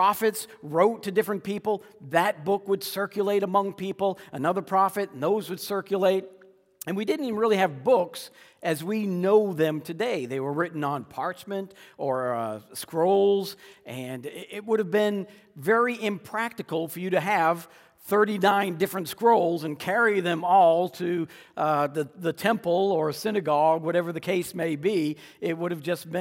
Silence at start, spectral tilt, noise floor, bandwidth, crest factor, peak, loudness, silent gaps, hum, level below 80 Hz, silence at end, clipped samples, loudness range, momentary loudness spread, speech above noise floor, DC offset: 0 s; -5.5 dB/octave; -48 dBFS; 16.5 kHz; 18 dB; -8 dBFS; -26 LUFS; none; none; -76 dBFS; 0 s; under 0.1%; 4 LU; 11 LU; 22 dB; under 0.1%